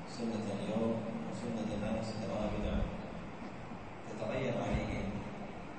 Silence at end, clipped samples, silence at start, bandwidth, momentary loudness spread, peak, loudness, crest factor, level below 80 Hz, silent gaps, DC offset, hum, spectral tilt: 0 s; under 0.1%; 0 s; 8.4 kHz; 10 LU; -22 dBFS; -39 LUFS; 16 dB; -48 dBFS; none; 0.3%; none; -6.5 dB/octave